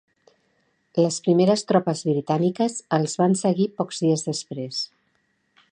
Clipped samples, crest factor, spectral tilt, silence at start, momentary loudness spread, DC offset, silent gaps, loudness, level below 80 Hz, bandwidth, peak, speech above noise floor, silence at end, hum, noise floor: under 0.1%; 20 dB; -5.5 dB/octave; 0.95 s; 10 LU; under 0.1%; none; -23 LUFS; -72 dBFS; 10.5 kHz; -4 dBFS; 47 dB; 0.85 s; none; -69 dBFS